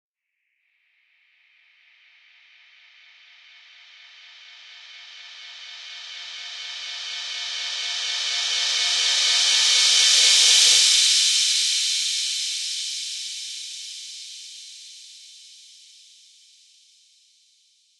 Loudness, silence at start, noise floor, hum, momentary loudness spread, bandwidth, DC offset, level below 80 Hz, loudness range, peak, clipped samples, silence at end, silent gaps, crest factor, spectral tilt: -18 LUFS; 4.25 s; -77 dBFS; none; 26 LU; 16.5 kHz; under 0.1%; -84 dBFS; 23 LU; -2 dBFS; under 0.1%; 2.65 s; none; 24 dB; 6.5 dB/octave